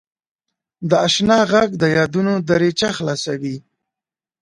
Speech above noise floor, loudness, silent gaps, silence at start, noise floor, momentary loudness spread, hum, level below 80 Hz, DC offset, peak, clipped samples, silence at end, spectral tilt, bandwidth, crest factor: 72 dB; -17 LUFS; none; 0.8 s; -89 dBFS; 12 LU; none; -54 dBFS; under 0.1%; 0 dBFS; under 0.1%; 0.8 s; -5 dB/octave; 11.5 kHz; 18 dB